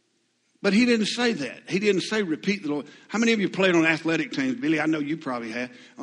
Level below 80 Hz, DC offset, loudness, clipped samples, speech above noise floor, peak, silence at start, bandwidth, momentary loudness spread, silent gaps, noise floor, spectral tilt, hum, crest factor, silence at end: -68 dBFS; under 0.1%; -24 LUFS; under 0.1%; 45 dB; -6 dBFS; 0.65 s; 11 kHz; 11 LU; none; -70 dBFS; -5 dB/octave; none; 18 dB; 0 s